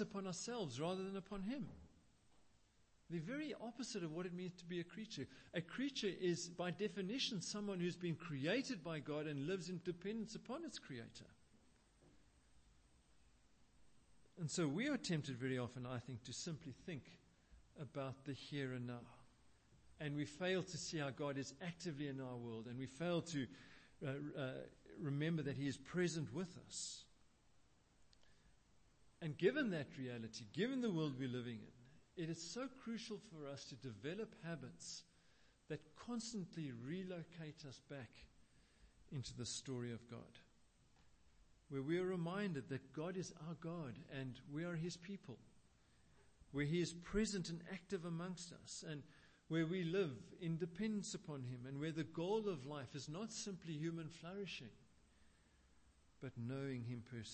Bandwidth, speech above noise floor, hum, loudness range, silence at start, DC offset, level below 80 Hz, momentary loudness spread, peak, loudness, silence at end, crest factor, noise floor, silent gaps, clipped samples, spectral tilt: 8.4 kHz; 29 dB; none; 8 LU; 0 s; under 0.1%; -72 dBFS; 11 LU; -24 dBFS; -46 LUFS; 0 s; 22 dB; -75 dBFS; none; under 0.1%; -5 dB/octave